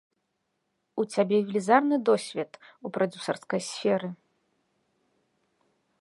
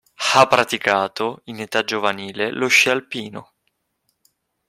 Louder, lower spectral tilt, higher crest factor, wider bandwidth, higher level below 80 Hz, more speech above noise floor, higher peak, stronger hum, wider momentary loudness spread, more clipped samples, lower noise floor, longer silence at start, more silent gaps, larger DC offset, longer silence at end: second, -27 LUFS vs -18 LUFS; first, -5 dB/octave vs -2.5 dB/octave; about the same, 24 dB vs 20 dB; second, 11.5 kHz vs 16.5 kHz; second, -80 dBFS vs -64 dBFS; about the same, 52 dB vs 52 dB; second, -6 dBFS vs 0 dBFS; neither; about the same, 15 LU vs 16 LU; neither; first, -78 dBFS vs -71 dBFS; first, 0.95 s vs 0.2 s; neither; neither; first, 1.85 s vs 1.25 s